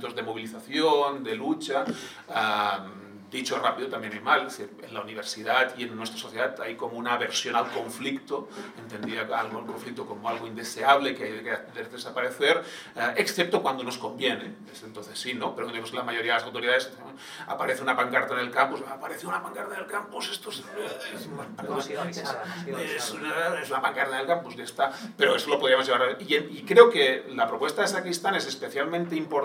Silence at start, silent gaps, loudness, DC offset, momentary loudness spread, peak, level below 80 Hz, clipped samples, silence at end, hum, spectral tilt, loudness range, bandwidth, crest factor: 0 s; none; -27 LUFS; under 0.1%; 14 LU; 0 dBFS; -80 dBFS; under 0.1%; 0 s; none; -3 dB/octave; 9 LU; 16.5 kHz; 28 dB